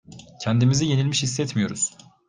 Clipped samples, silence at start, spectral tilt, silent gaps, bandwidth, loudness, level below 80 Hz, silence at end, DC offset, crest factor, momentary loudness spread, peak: under 0.1%; 0.1 s; -4.5 dB/octave; none; 9.8 kHz; -23 LUFS; -58 dBFS; 0.4 s; under 0.1%; 16 dB; 7 LU; -8 dBFS